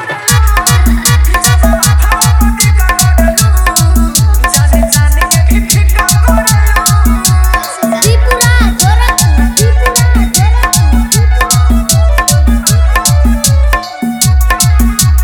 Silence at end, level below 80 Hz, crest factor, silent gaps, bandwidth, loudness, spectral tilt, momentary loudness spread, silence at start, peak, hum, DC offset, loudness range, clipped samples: 0 s; -10 dBFS; 8 dB; none; 19.5 kHz; -8 LUFS; -4 dB/octave; 1 LU; 0 s; 0 dBFS; none; under 0.1%; 1 LU; 0.5%